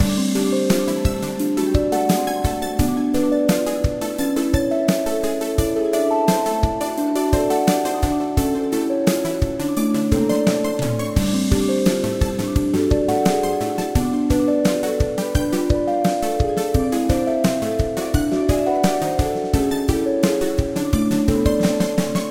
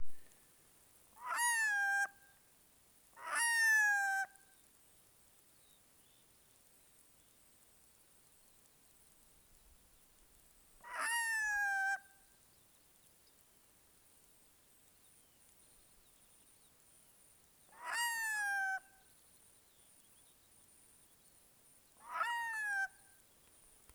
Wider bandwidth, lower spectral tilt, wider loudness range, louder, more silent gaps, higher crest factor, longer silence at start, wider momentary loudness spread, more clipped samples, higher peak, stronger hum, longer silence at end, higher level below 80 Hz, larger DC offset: second, 17 kHz vs over 20 kHz; first, -6 dB/octave vs 2 dB/octave; second, 1 LU vs 12 LU; first, -20 LUFS vs -36 LUFS; neither; about the same, 18 dB vs 20 dB; about the same, 0 s vs 0 s; second, 4 LU vs 16 LU; neither; first, 0 dBFS vs -24 dBFS; neither; second, 0 s vs 1.05 s; first, -30 dBFS vs -76 dBFS; neither